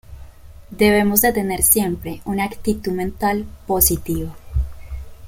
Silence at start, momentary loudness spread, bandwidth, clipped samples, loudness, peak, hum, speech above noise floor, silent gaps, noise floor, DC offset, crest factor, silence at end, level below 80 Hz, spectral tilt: 0.1 s; 12 LU; 17 kHz; under 0.1%; -18 LUFS; 0 dBFS; none; 20 dB; none; -39 dBFS; under 0.1%; 20 dB; 0 s; -32 dBFS; -4 dB/octave